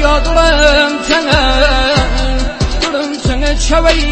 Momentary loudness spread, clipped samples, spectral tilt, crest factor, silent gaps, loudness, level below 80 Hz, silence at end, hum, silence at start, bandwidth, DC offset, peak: 7 LU; 0.3%; -4 dB/octave; 10 dB; none; -11 LUFS; -16 dBFS; 0 s; none; 0 s; 8.8 kHz; under 0.1%; 0 dBFS